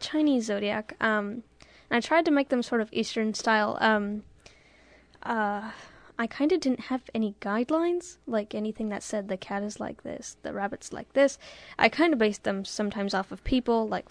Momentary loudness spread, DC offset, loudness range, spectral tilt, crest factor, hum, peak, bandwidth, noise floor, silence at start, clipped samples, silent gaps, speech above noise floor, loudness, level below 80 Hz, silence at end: 13 LU; under 0.1%; 5 LU; -4.5 dB/octave; 24 dB; none; -4 dBFS; 10.5 kHz; -57 dBFS; 0 s; under 0.1%; none; 30 dB; -28 LUFS; -54 dBFS; 0.1 s